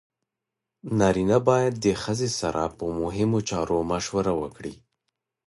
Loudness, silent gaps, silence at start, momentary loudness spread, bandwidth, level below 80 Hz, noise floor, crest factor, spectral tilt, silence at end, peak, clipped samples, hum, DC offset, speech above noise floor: -25 LUFS; none; 0.85 s; 9 LU; 11.5 kHz; -48 dBFS; -86 dBFS; 20 dB; -5.5 dB/octave; 0.7 s; -6 dBFS; under 0.1%; none; under 0.1%; 62 dB